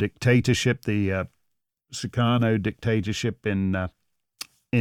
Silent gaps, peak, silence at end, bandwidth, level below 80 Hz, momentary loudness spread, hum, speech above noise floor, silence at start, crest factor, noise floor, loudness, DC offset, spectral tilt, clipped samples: none; -8 dBFS; 0 s; 15.5 kHz; -52 dBFS; 16 LU; none; 53 dB; 0 s; 16 dB; -77 dBFS; -24 LUFS; under 0.1%; -6 dB/octave; under 0.1%